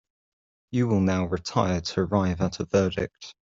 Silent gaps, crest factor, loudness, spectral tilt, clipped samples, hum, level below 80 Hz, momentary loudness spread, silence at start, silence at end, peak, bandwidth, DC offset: none; 20 dB; -26 LUFS; -6.5 dB/octave; under 0.1%; none; -54 dBFS; 6 LU; 0.7 s; 0.2 s; -6 dBFS; 7.6 kHz; under 0.1%